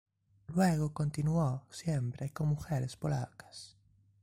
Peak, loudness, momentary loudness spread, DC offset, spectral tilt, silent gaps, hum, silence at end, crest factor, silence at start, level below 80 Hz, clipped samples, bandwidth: -16 dBFS; -34 LUFS; 17 LU; under 0.1%; -7 dB/octave; none; none; 0.55 s; 18 dB; 0.5 s; -58 dBFS; under 0.1%; 16 kHz